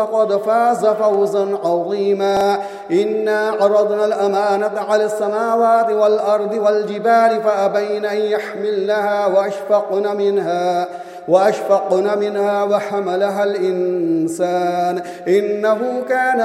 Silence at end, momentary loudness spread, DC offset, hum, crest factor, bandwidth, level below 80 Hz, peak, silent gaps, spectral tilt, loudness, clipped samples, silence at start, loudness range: 0 s; 5 LU; under 0.1%; none; 16 dB; 13 kHz; -68 dBFS; -2 dBFS; none; -5.5 dB/octave; -17 LUFS; under 0.1%; 0 s; 2 LU